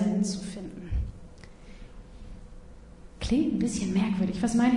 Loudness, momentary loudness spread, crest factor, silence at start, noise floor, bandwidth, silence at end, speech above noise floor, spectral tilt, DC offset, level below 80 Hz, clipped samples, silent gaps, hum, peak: -29 LUFS; 23 LU; 18 dB; 0 s; -47 dBFS; 11 kHz; 0 s; 22 dB; -6 dB/octave; under 0.1%; -42 dBFS; under 0.1%; none; none; -12 dBFS